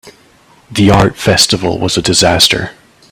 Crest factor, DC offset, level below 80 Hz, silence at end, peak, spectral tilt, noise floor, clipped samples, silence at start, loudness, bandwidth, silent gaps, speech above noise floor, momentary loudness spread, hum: 12 dB; under 0.1%; -34 dBFS; 0.4 s; 0 dBFS; -3.5 dB/octave; -46 dBFS; 0.2%; 0.05 s; -10 LUFS; over 20 kHz; none; 35 dB; 8 LU; none